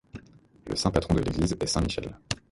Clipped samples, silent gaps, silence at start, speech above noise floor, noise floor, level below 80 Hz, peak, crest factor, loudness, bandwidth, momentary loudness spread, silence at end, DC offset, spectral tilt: under 0.1%; none; 0.15 s; 25 dB; -52 dBFS; -40 dBFS; -8 dBFS; 22 dB; -28 LUFS; 11.5 kHz; 22 LU; 0.15 s; under 0.1%; -5 dB/octave